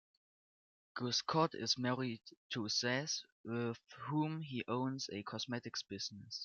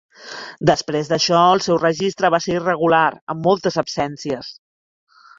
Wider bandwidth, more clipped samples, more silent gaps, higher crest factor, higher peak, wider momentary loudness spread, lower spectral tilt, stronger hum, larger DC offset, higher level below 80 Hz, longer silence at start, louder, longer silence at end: about the same, 7.2 kHz vs 7.8 kHz; neither; first, 2.37-2.50 s, 3.32-3.44 s vs 3.21-3.27 s; about the same, 22 dB vs 18 dB; second, -18 dBFS vs -2 dBFS; second, 9 LU vs 13 LU; about the same, -4 dB/octave vs -4.5 dB/octave; neither; neither; second, -82 dBFS vs -56 dBFS; first, 0.95 s vs 0.2 s; second, -39 LUFS vs -18 LUFS; second, 0 s vs 0.85 s